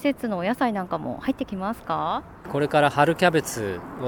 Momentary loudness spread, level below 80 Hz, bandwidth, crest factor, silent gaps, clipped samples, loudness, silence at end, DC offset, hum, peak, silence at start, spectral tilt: 11 LU; -52 dBFS; 19 kHz; 20 dB; none; under 0.1%; -24 LUFS; 0 s; under 0.1%; none; -4 dBFS; 0 s; -5.5 dB/octave